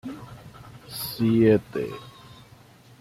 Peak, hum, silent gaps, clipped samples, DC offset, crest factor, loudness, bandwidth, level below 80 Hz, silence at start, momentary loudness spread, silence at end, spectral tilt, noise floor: -6 dBFS; none; none; under 0.1%; under 0.1%; 20 dB; -23 LUFS; 15.5 kHz; -58 dBFS; 0.05 s; 26 LU; 0.9 s; -6.5 dB/octave; -51 dBFS